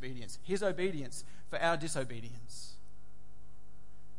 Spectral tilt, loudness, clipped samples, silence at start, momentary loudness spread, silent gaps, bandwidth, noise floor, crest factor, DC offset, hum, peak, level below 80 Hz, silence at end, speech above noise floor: -4.5 dB/octave; -37 LUFS; under 0.1%; 0 s; 16 LU; none; 11.5 kHz; -60 dBFS; 22 dB; 2%; none; -18 dBFS; -62 dBFS; 0.05 s; 23 dB